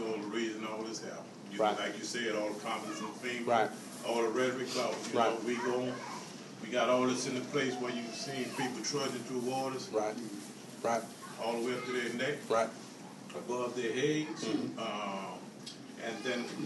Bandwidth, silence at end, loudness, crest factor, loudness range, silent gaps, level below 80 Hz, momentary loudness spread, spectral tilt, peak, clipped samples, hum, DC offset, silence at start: 12 kHz; 0 s; -35 LUFS; 20 dB; 3 LU; none; -82 dBFS; 13 LU; -4 dB/octave; -16 dBFS; under 0.1%; none; under 0.1%; 0 s